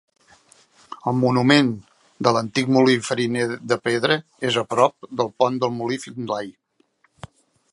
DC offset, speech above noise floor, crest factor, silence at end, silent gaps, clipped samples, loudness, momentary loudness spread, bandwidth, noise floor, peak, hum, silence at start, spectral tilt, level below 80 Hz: under 0.1%; 43 dB; 22 dB; 1.2 s; none; under 0.1%; -21 LUFS; 11 LU; 11.5 kHz; -64 dBFS; 0 dBFS; none; 0.9 s; -5 dB/octave; -64 dBFS